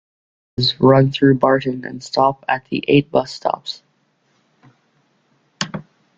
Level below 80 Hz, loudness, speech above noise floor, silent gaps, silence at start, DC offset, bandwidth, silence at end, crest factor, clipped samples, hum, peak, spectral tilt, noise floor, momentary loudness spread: -54 dBFS; -17 LUFS; 47 dB; none; 0.6 s; under 0.1%; 7.8 kHz; 0.35 s; 18 dB; under 0.1%; none; -2 dBFS; -6.5 dB/octave; -63 dBFS; 16 LU